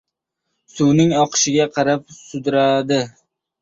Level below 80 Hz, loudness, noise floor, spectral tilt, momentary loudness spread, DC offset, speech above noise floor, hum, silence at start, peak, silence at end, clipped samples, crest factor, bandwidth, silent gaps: -58 dBFS; -17 LUFS; -77 dBFS; -4.5 dB/octave; 10 LU; under 0.1%; 60 dB; none; 0.75 s; -4 dBFS; 0.55 s; under 0.1%; 16 dB; 7.8 kHz; none